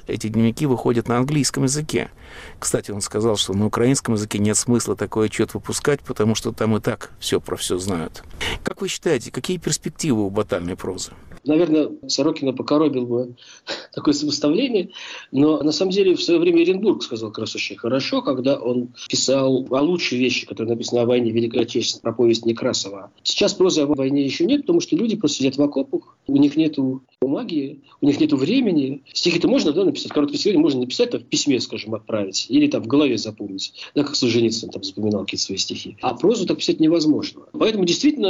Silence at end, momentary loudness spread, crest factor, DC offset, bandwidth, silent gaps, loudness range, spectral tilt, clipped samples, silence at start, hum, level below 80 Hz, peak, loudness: 0 s; 9 LU; 12 dB; under 0.1%; 15 kHz; none; 3 LU; -4.5 dB/octave; under 0.1%; 0.05 s; none; -50 dBFS; -8 dBFS; -20 LUFS